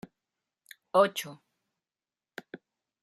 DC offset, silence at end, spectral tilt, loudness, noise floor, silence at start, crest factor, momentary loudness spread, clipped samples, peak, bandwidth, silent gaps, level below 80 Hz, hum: under 0.1%; 0.45 s; -4 dB/octave; -27 LUFS; under -90 dBFS; 0.95 s; 24 dB; 25 LU; under 0.1%; -10 dBFS; 14.5 kHz; none; -82 dBFS; none